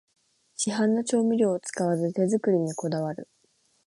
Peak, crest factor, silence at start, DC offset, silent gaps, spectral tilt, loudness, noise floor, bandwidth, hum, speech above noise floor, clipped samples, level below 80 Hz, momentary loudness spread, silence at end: -12 dBFS; 16 dB; 0.6 s; under 0.1%; none; -5.5 dB/octave; -26 LUFS; -68 dBFS; 11.5 kHz; none; 43 dB; under 0.1%; -74 dBFS; 8 LU; 0.6 s